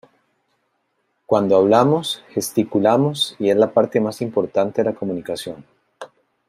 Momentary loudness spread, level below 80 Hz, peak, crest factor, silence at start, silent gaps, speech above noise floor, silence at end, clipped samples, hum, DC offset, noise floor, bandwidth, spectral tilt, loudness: 19 LU; -64 dBFS; -2 dBFS; 18 dB; 1.3 s; none; 52 dB; 0.4 s; under 0.1%; none; under 0.1%; -70 dBFS; 16 kHz; -5.5 dB/octave; -19 LUFS